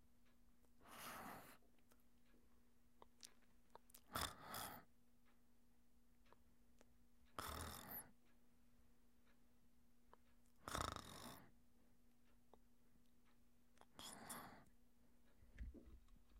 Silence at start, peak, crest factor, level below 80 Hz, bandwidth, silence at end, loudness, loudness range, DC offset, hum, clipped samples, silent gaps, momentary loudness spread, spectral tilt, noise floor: 0 s; -28 dBFS; 32 dB; -70 dBFS; 16 kHz; 0 s; -54 LUFS; 7 LU; under 0.1%; none; under 0.1%; none; 18 LU; -3 dB/octave; -78 dBFS